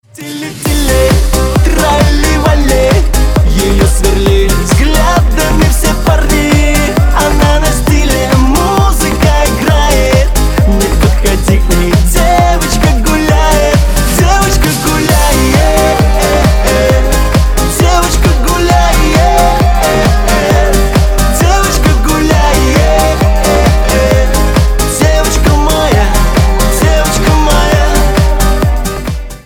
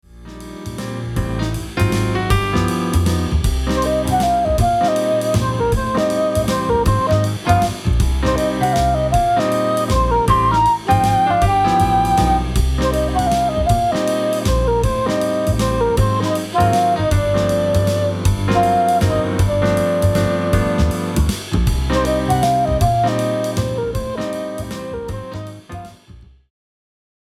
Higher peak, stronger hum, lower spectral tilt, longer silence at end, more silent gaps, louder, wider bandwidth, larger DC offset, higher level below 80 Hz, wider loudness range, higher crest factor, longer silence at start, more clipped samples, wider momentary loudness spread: about the same, 0 dBFS vs -2 dBFS; neither; about the same, -5 dB/octave vs -6 dB/octave; second, 0.05 s vs 1.15 s; neither; first, -9 LUFS vs -17 LUFS; first, 18.5 kHz vs 15.5 kHz; neither; first, -10 dBFS vs -26 dBFS; second, 1 LU vs 4 LU; second, 8 dB vs 14 dB; about the same, 0.2 s vs 0.15 s; neither; second, 2 LU vs 9 LU